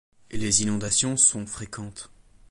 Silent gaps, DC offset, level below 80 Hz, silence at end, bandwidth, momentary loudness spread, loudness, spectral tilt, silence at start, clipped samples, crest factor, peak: none; under 0.1%; -50 dBFS; 0.45 s; 11.5 kHz; 20 LU; -21 LUFS; -2.5 dB/octave; 0.3 s; under 0.1%; 20 dB; -6 dBFS